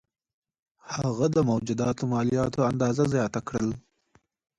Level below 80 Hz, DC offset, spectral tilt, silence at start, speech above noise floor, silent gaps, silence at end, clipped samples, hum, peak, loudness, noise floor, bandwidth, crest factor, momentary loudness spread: -54 dBFS; under 0.1%; -7 dB/octave; 0.85 s; 41 dB; none; 0.8 s; under 0.1%; none; -12 dBFS; -26 LUFS; -66 dBFS; 11 kHz; 16 dB; 7 LU